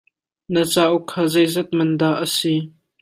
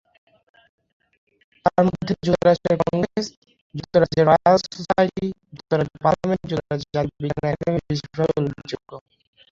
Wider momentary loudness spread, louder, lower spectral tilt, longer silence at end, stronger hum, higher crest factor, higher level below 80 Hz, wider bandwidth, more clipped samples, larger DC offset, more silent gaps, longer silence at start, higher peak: second, 6 LU vs 15 LU; about the same, -19 LUFS vs -21 LUFS; second, -5 dB/octave vs -7 dB/octave; second, 0.3 s vs 0.6 s; neither; about the same, 16 dB vs 20 dB; second, -62 dBFS vs -50 dBFS; first, 16 kHz vs 7.8 kHz; neither; neither; second, none vs 3.37-3.42 s, 3.61-3.70 s; second, 0.5 s vs 1.65 s; about the same, -2 dBFS vs -2 dBFS